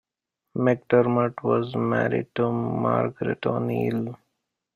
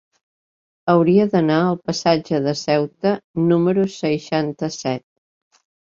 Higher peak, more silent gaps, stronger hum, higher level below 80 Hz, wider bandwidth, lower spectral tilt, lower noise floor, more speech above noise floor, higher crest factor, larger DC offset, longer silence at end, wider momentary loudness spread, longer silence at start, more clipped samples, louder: second, -6 dBFS vs -2 dBFS; second, none vs 3.24-3.34 s; neither; about the same, -62 dBFS vs -60 dBFS; second, 6.8 kHz vs 7.8 kHz; first, -9.5 dB/octave vs -6.5 dB/octave; second, -83 dBFS vs under -90 dBFS; second, 59 dB vs over 72 dB; about the same, 18 dB vs 18 dB; neither; second, 0.6 s vs 0.95 s; about the same, 7 LU vs 9 LU; second, 0.55 s vs 0.85 s; neither; second, -24 LUFS vs -19 LUFS